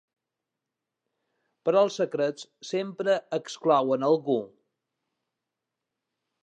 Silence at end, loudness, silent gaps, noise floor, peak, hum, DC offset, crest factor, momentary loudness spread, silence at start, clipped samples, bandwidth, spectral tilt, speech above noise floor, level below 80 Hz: 1.95 s; -26 LUFS; none; -87 dBFS; -10 dBFS; none; under 0.1%; 20 dB; 9 LU; 1.65 s; under 0.1%; 9.2 kHz; -5.5 dB/octave; 61 dB; -86 dBFS